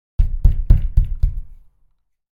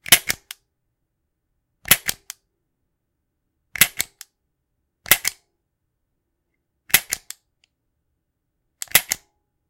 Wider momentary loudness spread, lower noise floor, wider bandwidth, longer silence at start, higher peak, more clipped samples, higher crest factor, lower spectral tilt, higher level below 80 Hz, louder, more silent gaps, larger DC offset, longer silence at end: second, 8 LU vs 23 LU; second, -60 dBFS vs -76 dBFS; second, 1.7 kHz vs 17 kHz; about the same, 0.2 s vs 0.1 s; about the same, 0 dBFS vs 0 dBFS; neither; second, 16 dB vs 26 dB; first, -10 dB/octave vs 0.5 dB/octave; first, -18 dBFS vs -54 dBFS; about the same, -21 LUFS vs -19 LUFS; neither; neither; first, 0.8 s vs 0.55 s